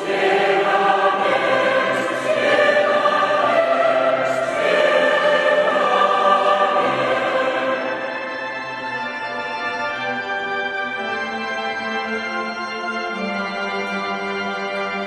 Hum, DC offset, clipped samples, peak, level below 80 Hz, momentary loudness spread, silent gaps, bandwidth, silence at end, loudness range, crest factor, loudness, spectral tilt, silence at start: none; under 0.1%; under 0.1%; -4 dBFS; -64 dBFS; 9 LU; none; 12 kHz; 0 s; 7 LU; 16 dB; -19 LUFS; -4 dB/octave; 0 s